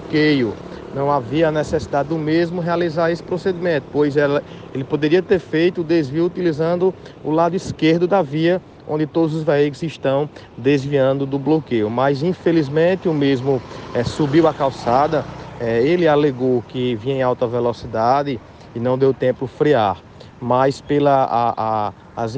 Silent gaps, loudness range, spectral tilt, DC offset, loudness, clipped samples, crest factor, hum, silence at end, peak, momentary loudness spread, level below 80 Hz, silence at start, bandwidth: none; 2 LU; -7.5 dB/octave; under 0.1%; -19 LUFS; under 0.1%; 14 dB; none; 0 s; -4 dBFS; 8 LU; -48 dBFS; 0 s; 9 kHz